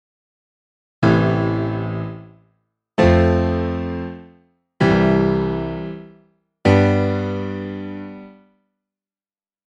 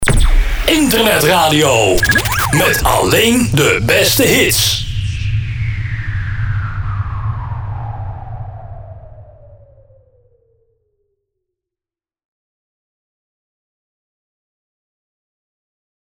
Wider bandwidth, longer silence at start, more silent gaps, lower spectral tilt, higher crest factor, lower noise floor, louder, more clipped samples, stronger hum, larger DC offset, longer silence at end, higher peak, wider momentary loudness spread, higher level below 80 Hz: second, 8.6 kHz vs over 20 kHz; first, 1 s vs 0 s; neither; first, -8 dB/octave vs -4 dB/octave; about the same, 20 dB vs 16 dB; about the same, under -90 dBFS vs under -90 dBFS; second, -19 LUFS vs -13 LUFS; neither; neither; neither; second, 1.35 s vs 6.75 s; about the same, 0 dBFS vs 0 dBFS; about the same, 18 LU vs 16 LU; second, -38 dBFS vs -24 dBFS